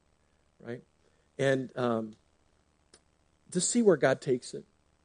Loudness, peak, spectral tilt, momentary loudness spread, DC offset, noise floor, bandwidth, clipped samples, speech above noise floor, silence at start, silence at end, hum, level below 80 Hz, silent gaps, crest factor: -29 LUFS; -10 dBFS; -4.5 dB/octave; 21 LU; under 0.1%; -70 dBFS; 10 kHz; under 0.1%; 42 dB; 0.65 s; 0.45 s; 60 Hz at -65 dBFS; -74 dBFS; none; 22 dB